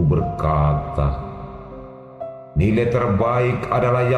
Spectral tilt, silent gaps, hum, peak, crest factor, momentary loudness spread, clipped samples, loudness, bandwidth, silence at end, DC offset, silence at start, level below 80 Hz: -9 dB/octave; none; none; -6 dBFS; 14 dB; 17 LU; under 0.1%; -20 LUFS; 8.6 kHz; 0 s; under 0.1%; 0 s; -32 dBFS